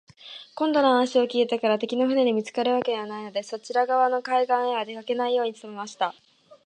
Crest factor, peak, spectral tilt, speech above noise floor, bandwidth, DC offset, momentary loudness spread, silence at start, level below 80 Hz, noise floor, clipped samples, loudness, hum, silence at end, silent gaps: 16 dB; -8 dBFS; -4 dB/octave; 21 dB; 9.2 kHz; under 0.1%; 11 LU; 0.25 s; -80 dBFS; -45 dBFS; under 0.1%; -24 LUFS; none; 0.1 s; none